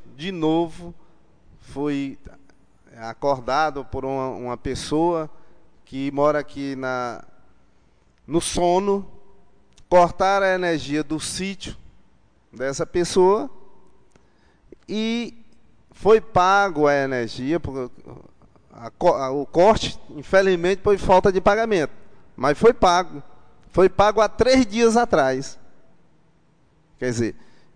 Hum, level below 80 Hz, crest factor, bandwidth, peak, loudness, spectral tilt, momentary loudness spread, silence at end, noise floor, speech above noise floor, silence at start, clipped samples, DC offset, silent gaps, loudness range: none; -44 dBFS; 16 dB; 10 kHz; -6 dBFS; -21 LUFS; -5 dB/octave; 15 LU; 0.3 s; -60 dBFS; 40 dB; 0 s; under 0.1%; under 0.1%; none; 8 LU